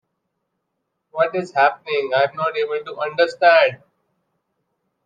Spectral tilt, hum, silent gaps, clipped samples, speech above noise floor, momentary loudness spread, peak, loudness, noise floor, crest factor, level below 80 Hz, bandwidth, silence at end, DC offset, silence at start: -4.5 dB/octave; none; none; under 0.1%; 58 dB; 11 LU; -2 dBFS; -19 LUFS; -76 dBFS; 20 dB; -76 dBFS; 7.8 kHz; 1.3 s; under 0.1%; 1.15 s